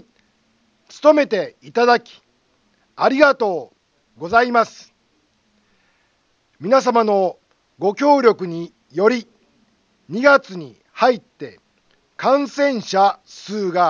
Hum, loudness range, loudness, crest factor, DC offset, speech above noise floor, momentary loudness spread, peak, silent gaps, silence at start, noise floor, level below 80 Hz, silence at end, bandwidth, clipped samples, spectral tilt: none; 3 LU; -17 LUFS; 20 dB; under 0.1%; 47 dB; 17 LU; 0 dBFS; none; 0.95 s; -63 dBFS; -66 dBFS; 0 s; 7.4 kHz; under 0.1%; -5 dB/octave